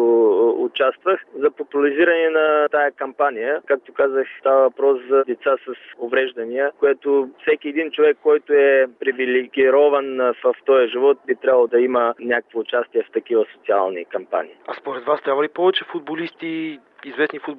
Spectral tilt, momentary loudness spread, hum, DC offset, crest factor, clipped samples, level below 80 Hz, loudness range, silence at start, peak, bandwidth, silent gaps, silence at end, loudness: -7 dB/octave; 11 LU; none; under 0.1%; 14 dB; under 0.1%; -72 dBFS; 5 LU; 0 s; -4 dBFS; 4.2 kHz; none; 0 s; -19 LUFS